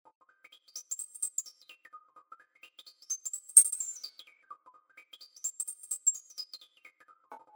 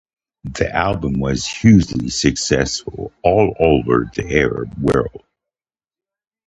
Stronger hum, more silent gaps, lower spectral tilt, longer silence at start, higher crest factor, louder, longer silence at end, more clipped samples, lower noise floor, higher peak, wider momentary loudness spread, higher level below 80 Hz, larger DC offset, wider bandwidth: neither; neither; second, 5.5 dB/octave vs -5.5 dB/octave; first, 0.75 s vs 0.45 s; first, 32 dB vs 18 dB; second, -28 LUFS vs -17 LUFS; second, 0.15 s vs 1.3 s; neither; second, -61 dBFS vs under -90 dBFS; second, -4 dBFS vs 0 dBFS; first, 26 LU vs 10 LU; second, under -90 dBFS vs -34 dBFS; neither; first, over 20 kHz vs 10.5 kHz